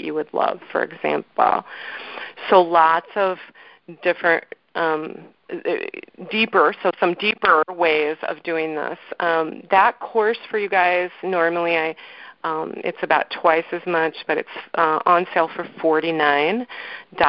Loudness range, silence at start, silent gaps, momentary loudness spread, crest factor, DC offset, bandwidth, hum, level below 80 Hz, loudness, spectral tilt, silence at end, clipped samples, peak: 2 LU; 0 s; none; 14 LU; 20 dB; under 0.1%; 5.6 kHz; none; -64 dBFS; -20 LUFS; -9 dB/octave; 0 s; under 0.1%; 0 dBFS